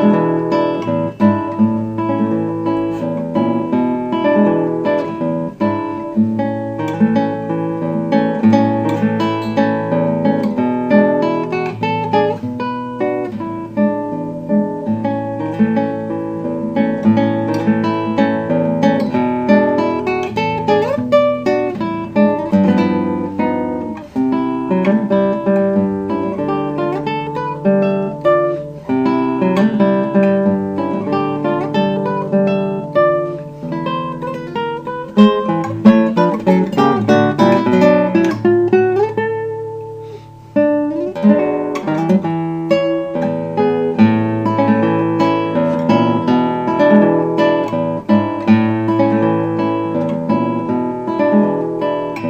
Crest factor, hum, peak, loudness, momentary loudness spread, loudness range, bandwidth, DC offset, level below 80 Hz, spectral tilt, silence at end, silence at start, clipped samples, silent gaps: 16 dB; none; 0 dBFS; -16 LUFS; 8 LU; 4 LU; 7.8 kHz; under 0.1%; -52 dBFS; -8.5 dB/octave; 0 s; 0 s; under 0.1%; none